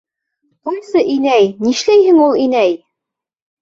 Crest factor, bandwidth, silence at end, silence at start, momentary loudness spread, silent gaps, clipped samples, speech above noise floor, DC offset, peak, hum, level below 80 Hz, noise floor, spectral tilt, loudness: 12 dB; 7.8 kHz; 0.85 s; 0.65 s; 14 LU; none; under 0.1%; 71 dB; under 0.1%; -2 dBFS; none; -58 dBFS; -83 dBFS; -4.5 dB/octave; -12 LUFS